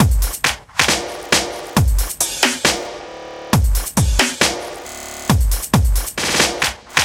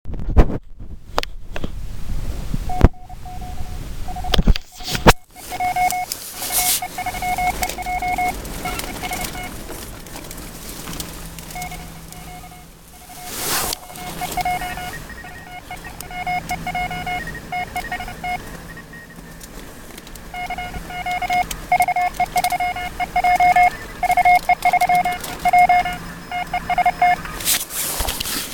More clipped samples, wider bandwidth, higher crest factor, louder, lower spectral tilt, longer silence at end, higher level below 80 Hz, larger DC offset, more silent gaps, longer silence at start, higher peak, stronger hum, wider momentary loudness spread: neither; about the same, 17 kHz vs 17.5 kHz; about the same, 18 dB vs 22 dB; first, -17 LUFS vs -20 LUFS; about the same, -3 dB/octave vs -3.5 dB/octave; about the same, 0 s vs 0 s; first, -22 dBFS vs -28 dBFS; neither; neither; about the same, 0 s vs 0.05 s; about the same, 0 dBFS vs 0 dBFS; neither; second, 13 LU vs 20 LU